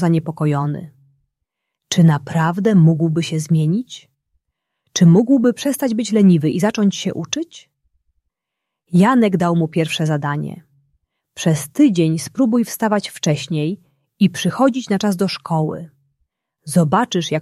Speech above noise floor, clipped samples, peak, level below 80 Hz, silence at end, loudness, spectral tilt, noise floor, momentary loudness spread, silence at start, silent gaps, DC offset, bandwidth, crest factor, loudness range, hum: 65 dB; under 0.1%; -2 dBFS; -58 dBFS; 0 s; -17 LUFS; -6 dB/octave; -81 dBFS; 11 LU; 0 s; none; under 0.1%; 14 kHz; 16 dB; 3 LU; none